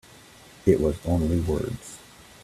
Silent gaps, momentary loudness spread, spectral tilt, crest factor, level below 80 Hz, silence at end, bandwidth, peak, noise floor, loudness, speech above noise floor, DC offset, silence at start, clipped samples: none; 17 LU; -7.5 dB/octave; 22 dB; -40 dBFS; 0.45 s; 14.5 kHz; -4 dBFS; -50 dBFS; -25 LUFS; 26 dB; under 0.1%; 0.65 s; under 0.1%